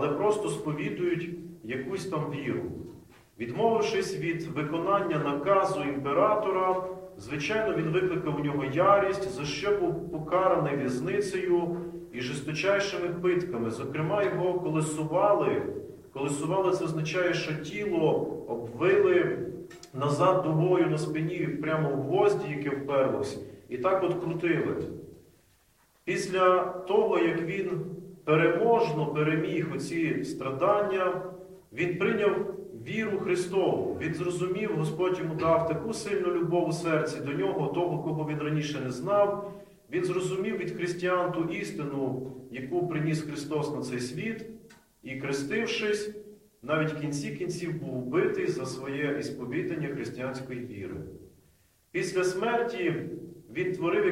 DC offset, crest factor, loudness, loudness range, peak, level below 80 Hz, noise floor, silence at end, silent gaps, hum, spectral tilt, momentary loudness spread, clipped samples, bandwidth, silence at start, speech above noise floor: under 0.1%; 20 dB; -29 LUFS; 5 LU; -8 dBFS; -62 dBFS; -65 dBFS; 0 s; none; none; -6 dB/octave; 12 LU; under 0.1%; 15 kHz; 0 s; 37 dB